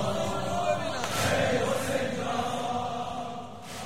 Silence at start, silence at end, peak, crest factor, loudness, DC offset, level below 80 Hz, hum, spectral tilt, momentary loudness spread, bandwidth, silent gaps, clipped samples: 0 s; 0 s; -12 dBFS; 16 dB; -29 LUFS; 0.8%; -54 dBFS; none; -4 dB/octave; 10 LU; 16 kHz; none; under 0.1%